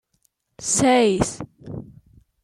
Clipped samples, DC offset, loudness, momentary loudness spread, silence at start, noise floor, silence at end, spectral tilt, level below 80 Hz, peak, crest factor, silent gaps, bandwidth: under 0.1%; under 0.1%; -19 LUFS; 20 LU; 0.6 s; -68 dBFS; 0.6 s; -4 dB/octave; -48 dBFS; -6 dBFS; 18 dB; none; 13 kHz